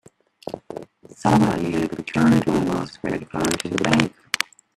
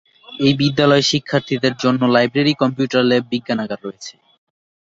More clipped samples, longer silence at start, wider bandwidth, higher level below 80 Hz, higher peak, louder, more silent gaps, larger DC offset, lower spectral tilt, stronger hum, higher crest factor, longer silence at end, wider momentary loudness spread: neither; first, 0.45 s vs 0.3 s; first, 14.5 kHz vs 7.8 kHz; first, -50 dBFS vs -56 dBFS; about the same, 0 dBFS vs -2 dBFS; second, -21 LUFS vs -17 LUFS; neither; neither; about the same, -5.5 dB/octave vs -5.5 dB/octave; neither; first, 22 dB vs 16 dB; second, 0.35 s vs 0.85 s; first, 18 LU vs 14 LU